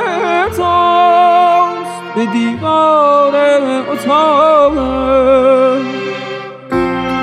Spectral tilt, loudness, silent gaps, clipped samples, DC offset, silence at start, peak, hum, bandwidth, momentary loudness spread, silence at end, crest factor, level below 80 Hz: -5.5 dB/octave; -11 LUFS; none; under 0.1%; under 0.1%; 0 s; 0 dBFS; none; 14 kHz; 11 LU; 0 s; 10 dB; -40 dBFS